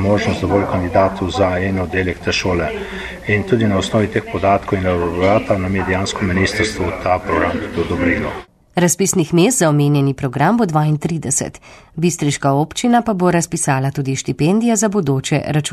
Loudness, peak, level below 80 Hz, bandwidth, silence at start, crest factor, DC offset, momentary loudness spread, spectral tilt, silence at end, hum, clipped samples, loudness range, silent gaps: -17 LUFS; -2 dBFS; -38 dBFS; 13 kHz; 0 s; 14 dB; under 0.1%; 6 LU; -5 dB/octave; 0 s; none; under 0.1%; 2 LU; none